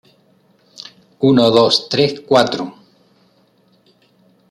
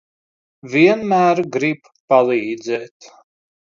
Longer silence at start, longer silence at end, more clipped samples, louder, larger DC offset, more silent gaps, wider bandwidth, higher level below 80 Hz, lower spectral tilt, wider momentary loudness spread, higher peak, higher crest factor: first, 1.2 s vs 0.65 s; first, 1.8 s vs 0.75 s; neither; first, -14 LUFS vs -17 LUFS; neither; second, none vs 2.00-2.08 s, 2.91-3.00 s; first, 13 kHz vs 7.4 kHz; first, -58 dBFS vs -66 dBFS; about the same, -5.5 dB/octave vs -6 dB/octave; first, 25 LU vs 11 LU; about the same, 0 dBFS vs 0 dBFS; about the same, 18 dB vs 18 dB